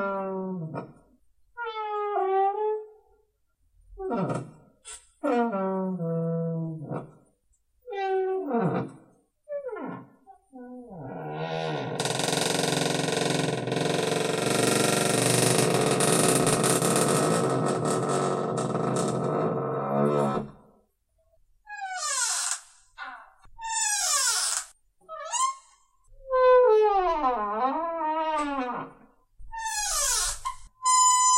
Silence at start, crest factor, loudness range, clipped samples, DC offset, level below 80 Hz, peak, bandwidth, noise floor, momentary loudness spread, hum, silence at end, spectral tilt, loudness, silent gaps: 0 s; 20 dB; 9 LU; under 0.1%; under 0.1%; -54 dBFS; -8 dBFS; 16 kHz; -69 dBFS; 17 LU; none; 0 s; -3.5 dB/octave; -26 LUFS; none